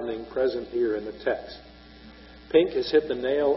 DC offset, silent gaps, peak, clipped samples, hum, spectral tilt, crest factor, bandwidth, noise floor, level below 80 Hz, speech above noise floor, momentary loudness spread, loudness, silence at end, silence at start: under 0.1%; none; -6 dBFS; under 0.1%; none; -3.5 dB/octave; 20 dB; 5.8 kHz; -48 dBFS; -54 dBFS; 23 dB; 10 LU; -26 LUFS; 0 s; 0 s